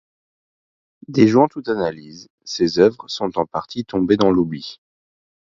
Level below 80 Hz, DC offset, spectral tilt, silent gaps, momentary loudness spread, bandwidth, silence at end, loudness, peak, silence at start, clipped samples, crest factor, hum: -52 dBFS; under 0.1%; -6.5 dB/octave; 2.30-2.38 s; 16 LU; 7.6 kHz; 0.85 s; -19 LUFS; 0 dBFS; 1.1 s; under 0.1%; 20 dB; none